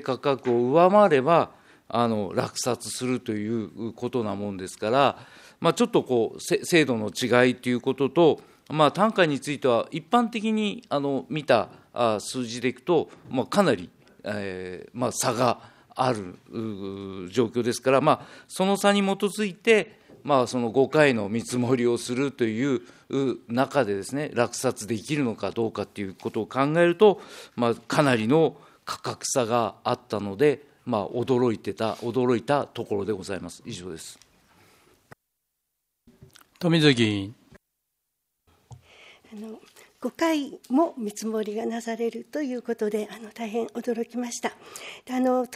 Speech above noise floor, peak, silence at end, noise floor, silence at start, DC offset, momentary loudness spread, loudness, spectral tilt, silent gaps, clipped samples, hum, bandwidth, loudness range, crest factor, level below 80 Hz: 55 dB; -4 dBFS; 0 s; -80 dBFS; 0 s; under 0.1%; 14 LU; -25 LUFS; -5 dB/octave; none; under 0.1%; none; 15.5 kHz; 7 LU; 22 dB; -68 dBFS